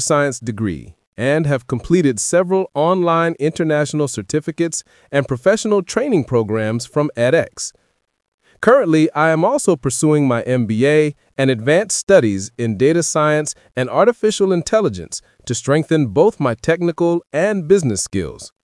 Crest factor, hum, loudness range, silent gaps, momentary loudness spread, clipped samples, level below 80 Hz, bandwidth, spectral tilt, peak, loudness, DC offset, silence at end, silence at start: 16 dB; none; 3 LU; 1.07-1.12 s, 8.28-8.38 s, 12.03-12.07 s; 9 LU; under 0.1%; -50 dBFS; 12 kHz; -5 dB/octave; 0 dBFS; -17 LUFS; under 0.1%; 0.15 s; 0 s